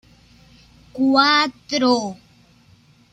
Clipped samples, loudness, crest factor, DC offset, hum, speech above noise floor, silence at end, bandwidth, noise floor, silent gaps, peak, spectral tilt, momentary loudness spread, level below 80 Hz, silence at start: under 0.1%; -17 LUFS; 20 dB; under 0.1%; none; 35 dB; 0.95 s; 9.2 kHz; -53 dBFS; none; -2 dBFS; -3 dB/octave; 14 LU; -60 dBFS; 0.95 s